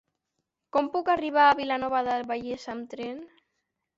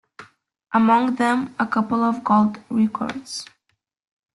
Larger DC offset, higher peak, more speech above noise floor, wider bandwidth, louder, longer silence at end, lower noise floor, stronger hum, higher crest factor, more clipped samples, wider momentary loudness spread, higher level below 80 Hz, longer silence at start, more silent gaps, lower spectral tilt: neither; second, -8 dBFS vs -4 dBFS; first, 56 dB vs 52 dB; second, 7.8 kHz vs 11.5 kHz; second, -26 LUFS vs -20 LUFS; second, 0.7 s vs 0.9 s; first, -82 dBFS vs -72 dBFS; neither; about the same, 20 dB vs 16 dB; neither; first, 16 LU vs 11 LU; about the same, -66 dBFS vs -64 dBFS; first, 0.75 s vs 0.2 s; neither; about the same, -4.5 dB/octave vs -5.5 dB/octave